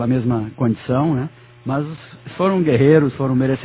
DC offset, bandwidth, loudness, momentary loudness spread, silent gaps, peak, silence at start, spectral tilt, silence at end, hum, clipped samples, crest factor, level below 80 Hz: under 0.1%; 4 kHz; -18 LUFS; 17 LU; none; 0 dBFS; 0 s; -12.5 dB/octave; 0 s; none; under 0.1%; 16 dB; -48 dBFS